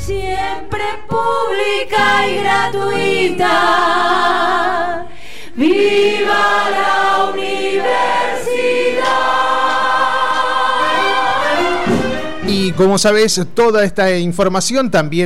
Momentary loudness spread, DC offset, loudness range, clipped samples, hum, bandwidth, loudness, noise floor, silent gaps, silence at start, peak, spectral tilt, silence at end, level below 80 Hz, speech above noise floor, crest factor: 7 LU; 6%; 1 LU; under 0.1%; none; 16 kHz; -14 LUFS; -35 dBFS; none; 0 s; -4 dBFS; -4 dB/octave; 0 s; -40 dBFS; 21 dB; 10 dB